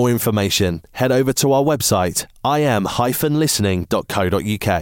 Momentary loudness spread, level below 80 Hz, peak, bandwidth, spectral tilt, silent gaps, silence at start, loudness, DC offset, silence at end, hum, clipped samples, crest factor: 5 LU; -44 dBFS; -6 dBFS; 17 kHz; -4.5 dB/octave; none; 0 s; -18 LUFS; under 0.1%; 0 s; none; under 0.1%; 12 dB